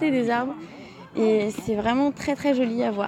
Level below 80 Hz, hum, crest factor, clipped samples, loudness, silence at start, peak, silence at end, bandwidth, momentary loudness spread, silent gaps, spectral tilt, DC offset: -56 dBFS; none; 14 dB; under 0.1%; -24 LUFS; 0 s; -10 dBFS; 0 s; 15 kHz; 14 LU; none; -6 dB/octave; under 0.1%